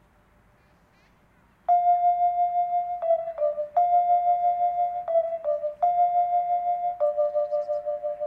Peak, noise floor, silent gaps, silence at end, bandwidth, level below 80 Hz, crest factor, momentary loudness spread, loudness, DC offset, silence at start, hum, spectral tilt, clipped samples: -12 dBFS; -60 dBFS; none; 0 s; 3.7 kHz; -66 dBFS; 12 dB; 7 LU; -24 LUFS; under 0.1%; 1.7 s; none; -6 dB/octave; under 0.1%